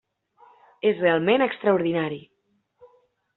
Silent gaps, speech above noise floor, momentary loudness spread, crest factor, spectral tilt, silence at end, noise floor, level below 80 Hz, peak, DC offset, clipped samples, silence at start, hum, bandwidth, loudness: none; 49 dB; 9 LU; 18 dB; -4 dB/octave; 1.15 s; -70 dBFS; -68 dBFS; -6 dBFS; under 0.1%; under 0.1%; 0.85 s; none; 4.2 kHz; -23 LUFS